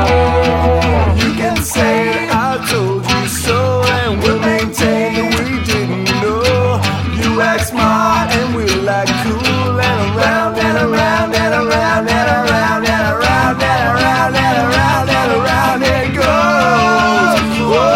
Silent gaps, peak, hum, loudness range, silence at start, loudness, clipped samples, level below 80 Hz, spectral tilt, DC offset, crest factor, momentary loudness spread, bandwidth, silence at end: none; 0 dBFS; none; 2 LU; 0 s; -13 LUFS; under 0.1%; -28 dBFS; -5 dB/octave; under 0.1%; 12 dB; 4 LU; 16.5 kHz; 0 s